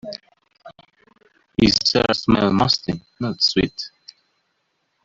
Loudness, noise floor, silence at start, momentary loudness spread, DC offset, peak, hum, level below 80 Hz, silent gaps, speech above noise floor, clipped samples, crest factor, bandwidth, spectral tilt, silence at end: -19 LUFS; -71 dBFS; 0.05 s; 17 LU; under 0.1%; -2 dBFS; none; -44 dBFS; none; 51 dB; under 0.1%; 20 dB; 7.8 kHz; -5 dB/octave; 1.15 s